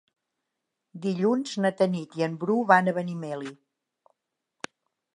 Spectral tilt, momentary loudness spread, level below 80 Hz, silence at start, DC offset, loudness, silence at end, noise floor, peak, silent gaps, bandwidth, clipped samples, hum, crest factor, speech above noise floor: -6.5 dB/octave; 21 LU; -80 dBFS; 0.95 s; under 0.1%; -26 LUFS; 1.65 s; -83 dBFS; -4 dBFS; none; 10.5 kHz; under 0.1%; none; 24 dB; 58 dB